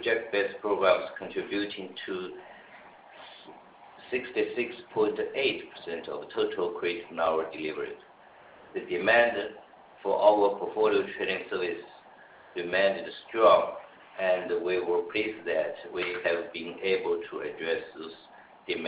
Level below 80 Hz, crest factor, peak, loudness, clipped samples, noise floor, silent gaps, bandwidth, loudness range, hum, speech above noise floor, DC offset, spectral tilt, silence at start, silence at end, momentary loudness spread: -68 dBFS; 22 dB; -6 dBFS; -29 LUFS; under 0.1%; -54 dBFS; none; 4 kHz; 6 LU; none; 25 dB; under 0.1%; -7.5 dB/octave; 0 s; 0 s; 19 LU